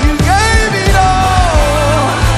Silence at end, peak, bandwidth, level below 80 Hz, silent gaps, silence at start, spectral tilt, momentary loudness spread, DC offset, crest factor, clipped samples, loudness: 0 s; 0 dBFS; 14.5 kHz; -14 dBFS; none; 0 s; -4.5 dB/octave; 2 LU; under 0.1%; 10 dB; under 0.1%; -10 LUFS